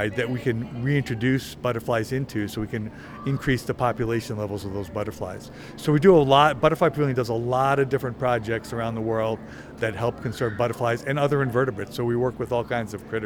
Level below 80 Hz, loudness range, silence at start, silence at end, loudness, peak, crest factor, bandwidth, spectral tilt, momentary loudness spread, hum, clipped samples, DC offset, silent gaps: -48 dBFS; 6 LU; 0 s; 0 s; -24 LUFS; -2 dBFS; 20 dB; 18.5 kHz; -6.5 dB/octave; 12 LU; none; under 0.1%; under 0.1%; none